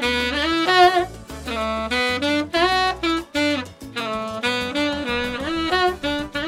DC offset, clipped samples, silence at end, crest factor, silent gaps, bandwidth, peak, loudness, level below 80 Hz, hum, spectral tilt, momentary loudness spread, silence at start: under 0.1%; under 0.1%; 0 s; 20 dB; none; 16 kHz; -2 dBFS; -21 LUFS; -42 dBFS; none; -3.5 dB/octave; 10 LU; 0 s